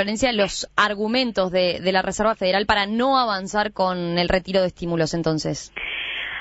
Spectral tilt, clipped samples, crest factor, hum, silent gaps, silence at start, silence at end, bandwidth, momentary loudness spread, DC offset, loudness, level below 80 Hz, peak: -4.5 dB/octave; under 0.1%; 18 dB; none; none; 0 s; 0 s; 8 kHz; 6 LU; under 0.1%; -21 LUFS; -44 dBFS; -4 dBFS